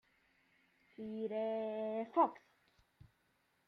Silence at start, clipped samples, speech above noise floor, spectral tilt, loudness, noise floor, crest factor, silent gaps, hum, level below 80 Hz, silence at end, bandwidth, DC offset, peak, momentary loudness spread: 1 s; under 0.1%; 40 dB; -8 dB/octave; -38 LUFS; -78 dBFS; 22 dB; none; none; -82 dBFS; 1.3 s; 6 kHz; under 0.1%; -20 dBFS; 11 LU